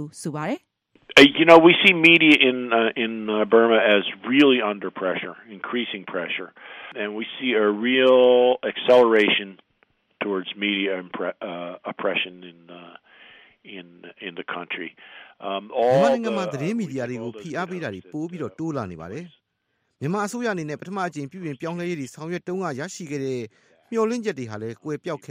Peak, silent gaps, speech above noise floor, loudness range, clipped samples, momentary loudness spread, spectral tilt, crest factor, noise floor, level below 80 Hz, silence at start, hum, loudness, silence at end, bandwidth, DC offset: 0 dBFS; none; 52 dB; 16 LU; under 0.1%; 20 LU; -5 dB/octave; 22 dB; -74 dBFS; -66 dBFS; 0 s; none; -20 LUFS; 0.15 s; 15 kHz; under 0.1%